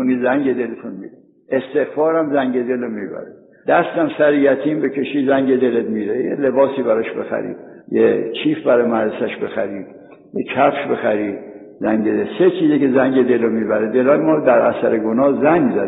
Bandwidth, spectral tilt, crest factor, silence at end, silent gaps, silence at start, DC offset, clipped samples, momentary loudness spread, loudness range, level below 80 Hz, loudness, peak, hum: 4 kHz; -5 dB/octave; 16 dB; 0 s; none; 0 s; under 0.1%; under 0.1%; 12 LU; 5 LU; -62 dBFS; -17 LUFS; -2 dBFS; none